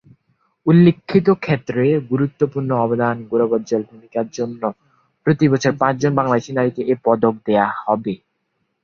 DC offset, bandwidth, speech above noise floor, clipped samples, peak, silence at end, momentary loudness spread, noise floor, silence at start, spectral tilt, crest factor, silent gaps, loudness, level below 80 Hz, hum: under 0.1%; 7.2 kHz; 53 dB; under 0.1%; -2 dBFS; 0.65 s; 10 LU; -71 dBFS; 0.65 s; -7.5 dB/octave; 16 dB; none; -18 LUFS; -56 dBFS; none